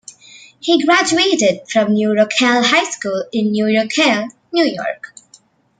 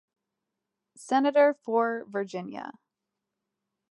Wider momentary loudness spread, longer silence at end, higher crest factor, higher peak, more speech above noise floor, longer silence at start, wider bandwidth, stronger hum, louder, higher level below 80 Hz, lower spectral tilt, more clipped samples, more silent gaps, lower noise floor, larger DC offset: second, 10 LU vs 17 LU; second, 0.75 s vs 1.2 s; about the same, 14 dB vs 18 dB; first, -2 dBFS vs -12 dBFS; second, 35 dB vs 59 dB; second, 0.35 s vs 1 s; second, 9.6 kHz vs 11.5 kHz; neither; first, -15 LUFS vs -26 LUFS; first, -62 dBFS vs -86 dBFS; second, -3.5 dB/octave vs -5 dB/octave; neither; neither; second, -50 dBFS vs -86 dBFS; neither